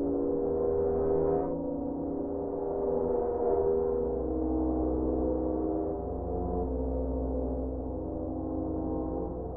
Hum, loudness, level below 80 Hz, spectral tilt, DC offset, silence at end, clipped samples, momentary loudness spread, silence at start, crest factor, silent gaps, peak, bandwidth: none; -31 LUFS; -40 dBFS; -9 dB/octave; under 0.1%; 0 s; under 0.1%; 6 LU; 0 s; 14 dB; none; -18 dBFS; 2.2 kHz